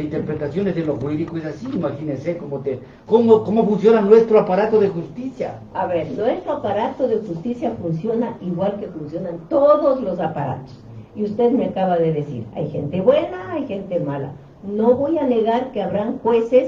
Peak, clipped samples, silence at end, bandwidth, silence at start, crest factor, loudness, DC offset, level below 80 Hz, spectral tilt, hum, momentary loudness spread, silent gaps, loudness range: 0 dBFS; under 0.1%; 0 s; 7 kHz; 0 s; 18 dB; -20 LUFS; under 0.1%; -52 dBFS; -9 dB/octave; none; 13 LU; none; 6 LU